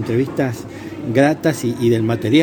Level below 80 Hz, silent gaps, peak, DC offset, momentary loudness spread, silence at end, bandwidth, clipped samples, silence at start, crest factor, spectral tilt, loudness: -52 dBFS; none; 0 dBFS; under 0.1%; 13 LU; 0 s; 18.5 kHz; under 0.1%; 0 s; 16 dB; -6.5 dB/octave; -18 LUFS